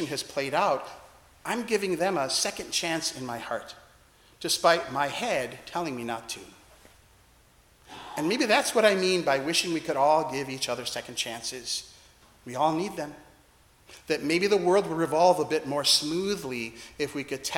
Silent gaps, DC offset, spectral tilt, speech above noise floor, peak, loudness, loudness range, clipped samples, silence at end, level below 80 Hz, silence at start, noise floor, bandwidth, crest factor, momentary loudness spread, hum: none; under 0.1%; -3 dB/octave; 32 dB; -6 dBFS; -27 LUFS; 7 LU; under 0.1%; 0 s; -62 dBFS; 0 s; -59 dBFS; 18 kHz; 22 dB; 14 LU; none